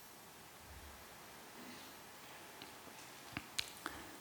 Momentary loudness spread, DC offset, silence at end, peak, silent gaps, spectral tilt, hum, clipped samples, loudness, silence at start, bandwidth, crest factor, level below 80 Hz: 12 LU; under 0.1%; 0 s; -18 dBFS; none; -2 dB/octave; none; under 0.1%; -50 LUFS; 0 s; 19.5 kHz; 34 dB; -70 dBFS